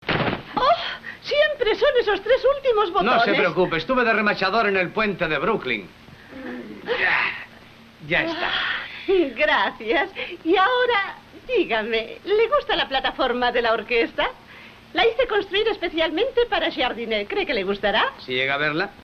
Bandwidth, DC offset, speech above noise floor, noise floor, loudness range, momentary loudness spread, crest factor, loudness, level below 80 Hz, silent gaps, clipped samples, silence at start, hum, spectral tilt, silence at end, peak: 6.8 kHz; under 0.1%; 25 dB; -46 dBFS; 4 LU; 8 LU; 14 dB; -21 LUFS; -48 dBFS; none; under 0.1%; 0 s; none; -5.5 dB/octave; 0 s; -8 dBFS